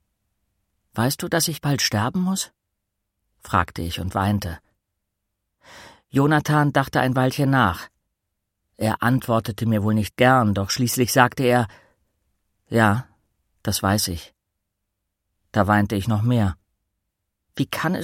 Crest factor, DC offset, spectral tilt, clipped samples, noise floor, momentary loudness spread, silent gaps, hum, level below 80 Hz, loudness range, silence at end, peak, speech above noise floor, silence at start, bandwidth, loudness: 22 dB; under 0.1%; -5 dB/octave; under 0.1%; -79 dBFS; 10 LU; none; none; -48 dBFS; 5 LU; 0 s; 0 dBFS; 58 dB; 0.95 s; 16.5 kHz; -21 LUFS